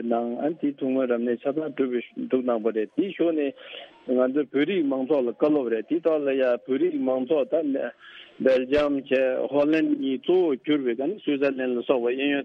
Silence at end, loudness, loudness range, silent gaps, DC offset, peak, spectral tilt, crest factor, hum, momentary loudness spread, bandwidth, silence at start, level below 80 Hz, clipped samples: 0 s; -25 LUFS; 3 LU; none; under 0.1%; -6 dBFS; -7.5 dB/octave; 18 dB; none; 6 LU; 6 kHz; 0 s; -62 dBFS; under 0.1%